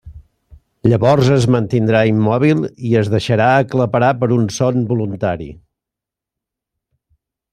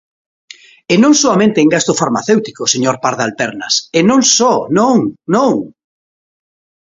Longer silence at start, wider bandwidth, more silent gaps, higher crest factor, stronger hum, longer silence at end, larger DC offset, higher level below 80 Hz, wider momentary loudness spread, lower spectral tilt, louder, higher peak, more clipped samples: second, 0.05 s vs 0.9 s; first, 10.5 kHz vs 7.8 kHz; neither; about the same, 16 dB vs 14 dB; neither; first, 2 s vs 1.15 s; neither; first, -46 dBFS vs -56 dBFS; about the same, 7 LU vs 7 LU; first, -7 dB/octave vs -3.5 dB/octave; second, -15 LUFS vs -12 LUFS; about the same, 0 dBFS vs 0 dBFS; neither